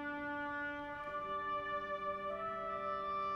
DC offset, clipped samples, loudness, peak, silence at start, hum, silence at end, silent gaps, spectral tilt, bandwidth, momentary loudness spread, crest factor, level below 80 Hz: under 0.1%; under 0.1%; -41 LUFS; -30 dBFS; 0 s; none; 0 s; none; -6 dB/octave; 8.4 kHz; 3 LU; 12 dB; -66 dBFS